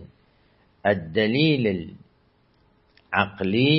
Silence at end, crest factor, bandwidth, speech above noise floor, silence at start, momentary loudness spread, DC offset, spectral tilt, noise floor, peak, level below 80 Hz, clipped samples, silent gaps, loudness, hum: 0 s; 22 dB; 5.8 kHz; 41 dB; 0 s; 8 LU; under 0.1%; -10.5 dB/octave; -62 dBFS; -2 dBFS; -58 dBFS; under 0.1%; none; -23 LUFS; none